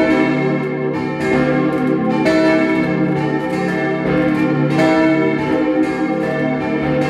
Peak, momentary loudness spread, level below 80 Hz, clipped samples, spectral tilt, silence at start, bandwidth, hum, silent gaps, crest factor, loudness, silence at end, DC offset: -2 dBFS; 5 LU; -46 dBFS; under 0.1%; -7.5 dB/octave; 0 s; 10.5 kHz; none; none; 14 dB; -16 LUFS; 0 s; under 0.1%